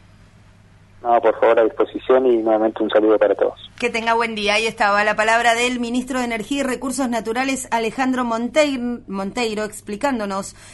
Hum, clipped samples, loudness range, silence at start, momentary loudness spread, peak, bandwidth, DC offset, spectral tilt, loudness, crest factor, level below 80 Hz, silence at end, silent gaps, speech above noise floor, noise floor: none; under 0.1%; 4 LU; 1.05 s; 9 LU; -2 dBFS; 12 kHz; under 0.1%; -3.5 dB/octave; -19 LUFS; 16 dB; -50 dBFS; 0 s; none; 30 dB; -48 dBFS